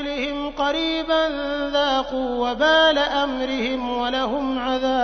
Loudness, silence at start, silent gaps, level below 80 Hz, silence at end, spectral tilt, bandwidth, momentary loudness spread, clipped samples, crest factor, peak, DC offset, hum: -21 LUFS; 0 s; none; -44 dBFS; 0 s; -3.5 dB/octave; 6.6 kHz; 8 LU; under 0.1%; 16 dB; -4 dBFS; under 0.1%; none